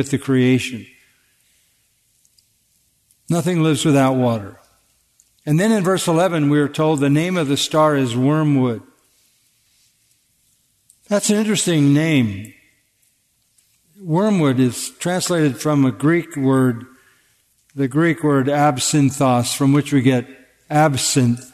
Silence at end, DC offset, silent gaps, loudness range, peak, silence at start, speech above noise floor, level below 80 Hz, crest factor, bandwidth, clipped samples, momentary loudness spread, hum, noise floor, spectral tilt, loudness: 0.05 s; under 0.1%; none; 6 LU; -4 dBFS; 0 s; 47 dB; -62 dBFS; 16 dB; 13.5 kHz; under 0.1%; 7 LU; none; -64 dBFS; -5.5 dB/octave; -17 LUFS